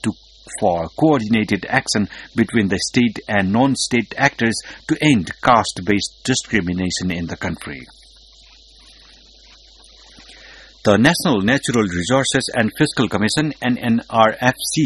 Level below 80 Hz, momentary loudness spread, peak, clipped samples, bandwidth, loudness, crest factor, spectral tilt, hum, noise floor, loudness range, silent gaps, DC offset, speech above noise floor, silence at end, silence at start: -46 dBFS; 9 LU; 0 dBFS; under 0.1%; 12.5 kHz; -18 LUFS; 18 dB; -4.5 dB/octave; none; -47 dBFS; 9 LU; none; under 0.1%; 29 dB; 0 s; 0.05 s